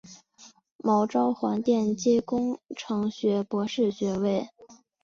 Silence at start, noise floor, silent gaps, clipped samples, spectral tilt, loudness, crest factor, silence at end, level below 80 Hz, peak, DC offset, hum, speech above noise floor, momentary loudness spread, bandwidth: 0.05 s; -55 dBFS; 0.72-0.79 s; under 0.1%; -6 dB/octave; -27 LUFS; 14 dB; 0.3 s; -66 dBFS; -12 dBFS; under 0.1%; none; 30 dB; 8 LU; 7.4 kHz